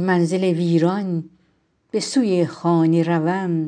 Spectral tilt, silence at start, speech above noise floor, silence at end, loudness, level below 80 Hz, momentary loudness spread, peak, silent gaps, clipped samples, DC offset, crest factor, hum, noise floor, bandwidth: -6.5 dB/octave; 0 s; 45 dB; 0 s; -20 LUFS; -70 dBFS; 8 LU; -6 dBFS; none; under 0.1%; under 0.1%; 14 dB; none; -64 dBFS; 10 kHz